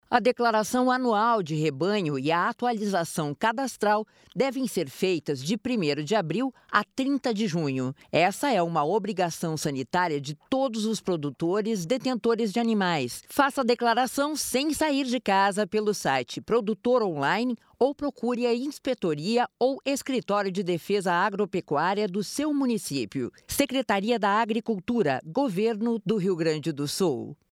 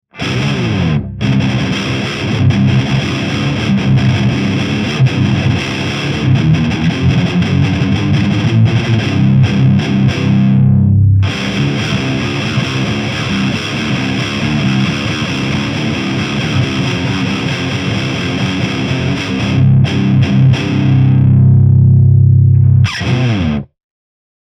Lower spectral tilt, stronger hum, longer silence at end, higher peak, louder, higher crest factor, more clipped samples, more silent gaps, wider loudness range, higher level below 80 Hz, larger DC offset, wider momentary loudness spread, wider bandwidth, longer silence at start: second, -5 dB/octave vs -6.5 dB/octave; neither; second, 0.2 s vs 0.85 s; second, -6 dBFS vs 0 dBFS; second, -26 LUFS vs -13 LUFS; first, 20 dB vs 12 dB; neither; neither; second, 2 LU vs 6 LU; second, -64 dBFS vs -34 dBFS; neither; about the same, 6 LU vs 7 LU; first, 17 kHz vs 9.6 kHz; about the same, 0.1 s vs 0.15 s